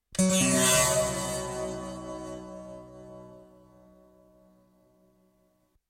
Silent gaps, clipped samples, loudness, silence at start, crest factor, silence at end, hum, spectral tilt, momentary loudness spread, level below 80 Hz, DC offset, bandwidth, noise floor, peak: none; under 0.1%; -26 LUFS; 0.1 s; 20 dB; 2.45 s; none; -3 dB/octave; 26 LU; -54 dBFS; under 0.1%; 16.5 kHz; -69 dBFS; -10 dBFS